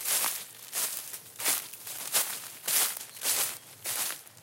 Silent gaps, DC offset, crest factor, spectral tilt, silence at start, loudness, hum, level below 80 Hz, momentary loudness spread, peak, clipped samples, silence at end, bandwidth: none; under 0.1%; 22 dB; 1.5 dB/octave; 0 s; -30 LUFS; none; -90 dBFS; 11 LU; -12 dBFS; under 0.1%; 0 s; 17 kHz